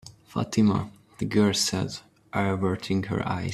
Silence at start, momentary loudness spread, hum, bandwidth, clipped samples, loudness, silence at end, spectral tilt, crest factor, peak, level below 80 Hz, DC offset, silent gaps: 0.05 s; 12 LU; none; 13.5 kHz; under 0.1%; -26 LUFS; 0 s; -5 dB/octave; 18 dB; -8 dBFS; -56 dBFS; under 0.1%; none